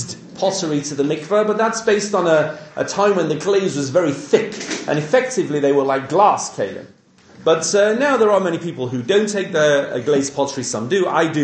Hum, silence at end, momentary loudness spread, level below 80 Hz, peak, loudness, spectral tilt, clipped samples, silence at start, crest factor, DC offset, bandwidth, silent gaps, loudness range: none; 0 s; 9 LU; -64 dBFS; 0 dBFS; -18 LUFS; -4.5 dB/octave; under 0.1%; 0 s; 18 dB; under 0.1%; 9.4 kHz; none; 1 LU